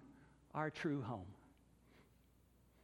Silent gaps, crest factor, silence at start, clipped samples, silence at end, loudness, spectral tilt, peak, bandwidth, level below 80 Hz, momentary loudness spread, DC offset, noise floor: none; 22 dB; 0 s; under 0.1%; 0.8 s; -44 LUFS; -7 dB/octave; -26 dBFS; 17 kHz; -74 dBFS; 22 LU; under 0.1%; -71 dBFS